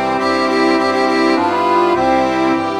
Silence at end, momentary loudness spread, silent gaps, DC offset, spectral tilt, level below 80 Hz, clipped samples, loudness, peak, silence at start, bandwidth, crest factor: 0 s; 2 LU; none; 0.3%; -5 dB/octave; -46 dBFS; under 0.1%; -14 LUFS; -2 dBFS; 0 s; 11 kHz; 12 dB